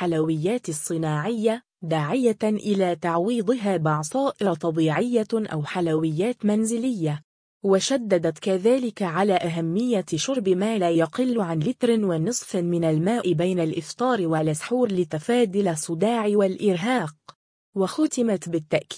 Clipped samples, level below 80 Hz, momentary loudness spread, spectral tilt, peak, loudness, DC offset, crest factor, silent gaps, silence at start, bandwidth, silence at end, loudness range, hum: under 0.1%; -66 dBFS; 5 LU; -5.5 dB/octave; -8 dBFS; -24 LUFS; under 0.1%; 16 dB; 7.24-7.61 s, 17.35-17.73 s; 0 s; 10.5 kHz; 0 s; 1 LU; none